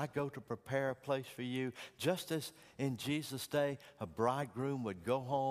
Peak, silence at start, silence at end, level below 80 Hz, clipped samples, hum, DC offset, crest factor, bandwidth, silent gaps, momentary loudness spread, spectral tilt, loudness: -20 dBFS; 0 s; 0 s; -74 dBFS; under 0.1%; none; under 0.1%; 18 dB; 15.5 kHz; none; 6 LU; -5.5 dB/octave; -39 LUFS